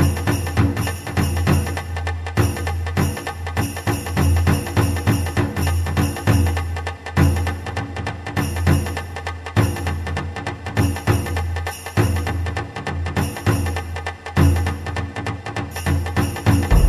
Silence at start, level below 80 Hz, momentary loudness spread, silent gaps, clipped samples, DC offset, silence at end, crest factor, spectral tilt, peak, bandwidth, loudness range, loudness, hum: 0 s; -28 dBFS; 9 LU; none; under 0.1%; under 0.1%; 0 s; 18 dB; -6 dB/octave; -2 dBFS; 13.5 kHz; 3 LU; -21 LUFS; none